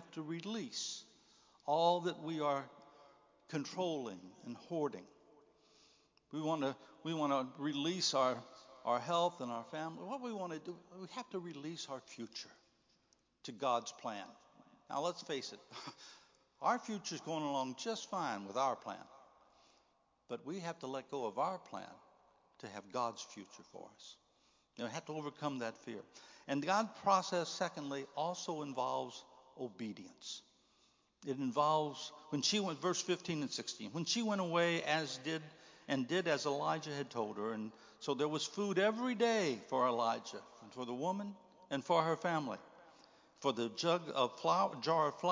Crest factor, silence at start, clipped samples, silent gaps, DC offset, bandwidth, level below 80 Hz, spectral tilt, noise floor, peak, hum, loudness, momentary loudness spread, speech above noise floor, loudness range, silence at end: 22 dB; 0 s; under 0.1%; none; under 0.1%; 7.6 kHz; -88 dBFS; -4 dB/octave; -76 dBFS; -18 dBFS; none; -39 LUFS; 16 LU; 37 dB; 8 LU; 0 s